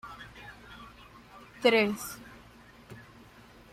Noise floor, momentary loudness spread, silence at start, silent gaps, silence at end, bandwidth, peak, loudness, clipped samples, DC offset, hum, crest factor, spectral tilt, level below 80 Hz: -54 dBFS; 27 LU; 0.05 s; none; 0.7 s; 16 kHz; -10 dBFS; -27 LUFS; under 0.1%; under 0.1%; none; 24 dB; -4 dB/octave; -62 dBFS